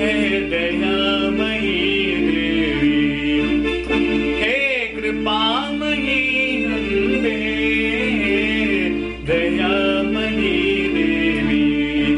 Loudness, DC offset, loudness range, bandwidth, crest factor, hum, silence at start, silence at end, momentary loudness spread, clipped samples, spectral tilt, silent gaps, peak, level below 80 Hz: -18 LUFS; under 0.1%; 1 LU; 10 kHz; 12 dB; none; 0 s; 0 s; 3 LU; under 0.1%; -5.5 dB/octave; none; -6 dBFS; -36 dBFS